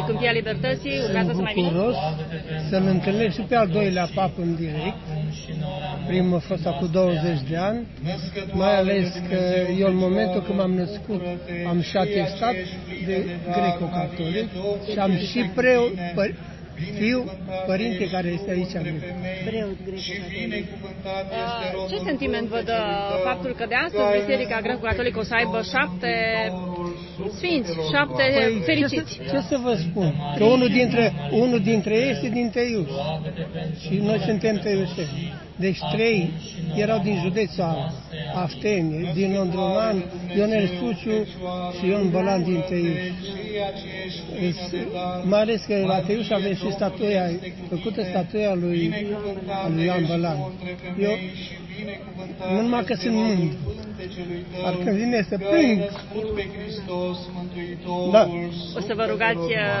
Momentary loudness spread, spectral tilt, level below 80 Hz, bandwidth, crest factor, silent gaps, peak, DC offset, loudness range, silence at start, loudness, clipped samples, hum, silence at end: 10 LU; -7 dB/octave; -46 dBFS; 6.2 kHz; 20 dB; none; -4 dBFS; under 0.1%; 5 LU; 0 s; -24 LUFS; under 0.1%; none; 0 s